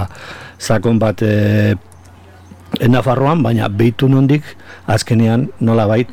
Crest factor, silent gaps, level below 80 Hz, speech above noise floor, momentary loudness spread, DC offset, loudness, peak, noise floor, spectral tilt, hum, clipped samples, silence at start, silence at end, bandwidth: 10 dB; none; -42 dBFS; 27 dB; 13 LU; under 0.1%; -14 LUFS; -4 dBFS; -40 dBFS; -7 dB/octave; none; under 0.1%; 0 s; 0 s; 15 kHz